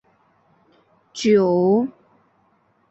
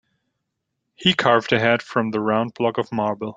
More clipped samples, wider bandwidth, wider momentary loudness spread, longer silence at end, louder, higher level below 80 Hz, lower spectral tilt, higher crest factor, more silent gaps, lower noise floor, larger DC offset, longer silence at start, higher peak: neither; about the same, 8.2 kHz vs 7.8 kHz; first, 13 LU vs 6 LU; first, 1 s vs 0.05 s; about the same, -19 LUFS vs -20 LUFS; about the same, -66 dBFS vs -62 dBFS; about the same, -6.5 dB/octave vs -5.5 dB/octave; about the same, 18 dB vs 20 dB; neither; second, -62 dBFS vs -78 dBFS; neither; first, 1.15 s vs 1 s; second, -6 dBFS vs -2 dBFS